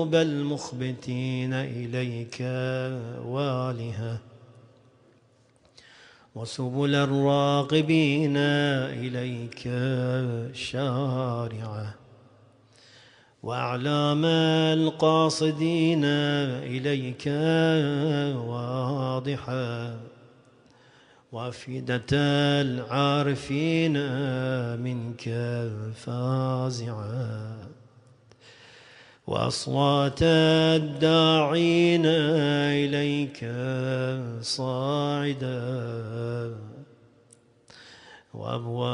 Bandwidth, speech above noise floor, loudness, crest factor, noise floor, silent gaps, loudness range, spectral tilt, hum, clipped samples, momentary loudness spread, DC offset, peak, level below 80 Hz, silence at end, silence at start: 10.5 kHz; 36 dB; -26 LUFS; 18 dB; -61 dBFS; none; 10 LU; -6 dB/octave; none; under 0.1%; 13 LU; under 0.1%; -8 dBFS; -60 dBFS; 0 s; 0 s